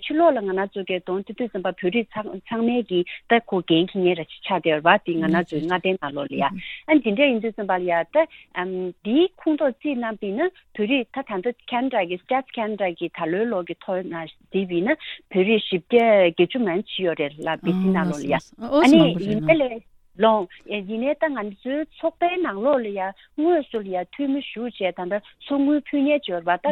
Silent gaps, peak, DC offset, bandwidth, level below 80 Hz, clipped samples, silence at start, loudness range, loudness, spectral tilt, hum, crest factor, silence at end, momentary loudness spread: none; 0 dBFS; under 0.1%; 10 kHz; -60 dBFS; under 0.1%; 0 s; 5 LU; -22 LUFS; -6.5 dB/octave; none; 22 dB; 0 s; 10 LU